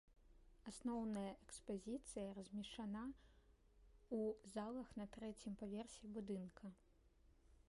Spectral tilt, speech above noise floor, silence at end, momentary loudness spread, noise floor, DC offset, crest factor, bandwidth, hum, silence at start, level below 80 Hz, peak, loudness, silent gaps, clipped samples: -5.5 dB/octave; 23 dB; 0.05 s; 10 LU; -73 dBFS; under 0.1%; 16 dB; 11.5 kHz; none; 0.1 s; -70 dBFS; -36 dBFS; -51 LUFS; none; under 0.1%